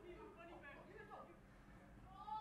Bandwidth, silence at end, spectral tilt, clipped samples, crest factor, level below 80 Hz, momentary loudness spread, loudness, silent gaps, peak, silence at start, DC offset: 12.5 kHz; 0 s; -6 dB/octave; under 0.1%; 16 dB; -70 dBFS; 7 LU; -59 LUFS; none; -40 dBFS; 0 s; under 0.1%